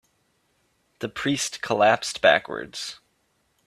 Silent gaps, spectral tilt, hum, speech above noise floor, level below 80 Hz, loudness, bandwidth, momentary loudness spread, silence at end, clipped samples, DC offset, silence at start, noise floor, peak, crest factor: none; -3 dB/octave; none; 46 dB; -64 dBFS; -23 LUFS; 15 kHz; 14 LU; 0.7 s; under 0.1%; under 0.1%; 1 s; -69 dBFS; -2 dBFS; 24 dB